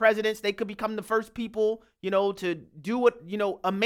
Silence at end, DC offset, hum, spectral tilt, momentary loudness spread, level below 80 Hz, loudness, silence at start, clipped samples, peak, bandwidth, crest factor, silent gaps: 0 s; under 0.1%; none; -5 dB/octave; 8 LU; -64 dBFS; -28 LUFS; 0 s; under 0.1%; -8 dBFS; 16 kHz; 20 dB; none